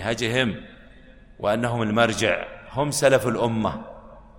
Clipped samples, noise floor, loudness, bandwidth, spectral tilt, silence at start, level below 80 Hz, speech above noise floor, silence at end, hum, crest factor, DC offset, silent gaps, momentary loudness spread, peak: under 0.1%; -48 dBFS; -23 LUFS; 16.5 kHz; -4.5 dB/octave; 0 s; -48 dBFS; 25 dB; 0 s; none; 18 dB; under 0.1%; none; 12 LU; -6 dBFS